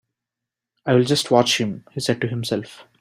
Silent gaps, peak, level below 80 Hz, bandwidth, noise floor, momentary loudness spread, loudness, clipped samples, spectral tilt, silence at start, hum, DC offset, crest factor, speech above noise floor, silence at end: none; -2 dBFS; -60 dBFS; 16 kHz; -86 dBFS; 11 LU; -20 LUFS; under 0.1%; -4.5 dB/octave; 0.85 s; none; under 0.1%; 20 dB; 65 dB; 0.2 s